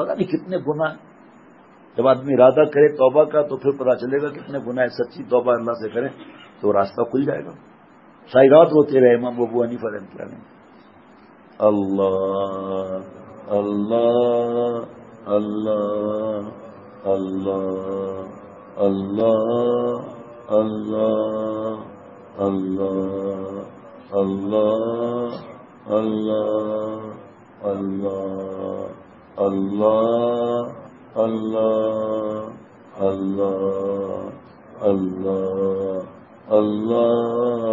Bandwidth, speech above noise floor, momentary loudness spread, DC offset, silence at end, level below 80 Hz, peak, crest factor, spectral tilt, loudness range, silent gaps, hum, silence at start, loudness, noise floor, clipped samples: 7.2 kHz; 29 dB; 17 LU; under 0.1%; 0 s; -66 dBFS; 0 dBFS; 20 dB; -9 dB/octave; 7 LU; none; none; 0 s; -21 LUFS; -49 dBFS; under 0.1%